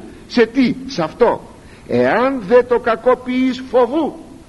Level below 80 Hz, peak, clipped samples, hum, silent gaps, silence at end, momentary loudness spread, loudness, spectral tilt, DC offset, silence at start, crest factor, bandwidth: -46 dBFS; 0 dBFS; under 0.1%; none; none; 0.05 s; 8 LU; -16 LUFS; -6 dB/octave; under 0.1%; 0 s; 16 dB; 11.5 kHz